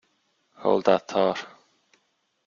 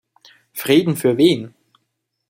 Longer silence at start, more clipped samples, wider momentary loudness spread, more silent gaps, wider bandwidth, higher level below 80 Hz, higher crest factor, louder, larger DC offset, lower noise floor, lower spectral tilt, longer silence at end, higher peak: about the same, 0.6 s vs 0.55 s; neither; second, 13 LU vs 17 LU; neither; second, 7.4 kHz vs 16.5 kHz; second, -68 dBFS vs -62 dBFS; about the same, 22 dB vs 18 dB; second, -24 LUFS vs -17 LUFS; neither; about the same, -72 dBFS vs -74 dBFS; about the same, -5.5 dB/octave vs -5.5 dB/octave; first, 1 s vs 0.8 s; about the same, -4 dBFS vs -2 dBFS